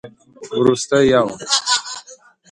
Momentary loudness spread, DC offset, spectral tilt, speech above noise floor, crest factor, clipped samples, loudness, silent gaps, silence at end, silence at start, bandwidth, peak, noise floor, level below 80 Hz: 14 LU; under 0.1%; -3 dB/octave; 29 dB; 18 dB; under 0.1%; -16 LUFS; none; 0.35 s; 0.05 s; 11.5 kHz; 0 dBFS; -45 dBFS; -52 dBFS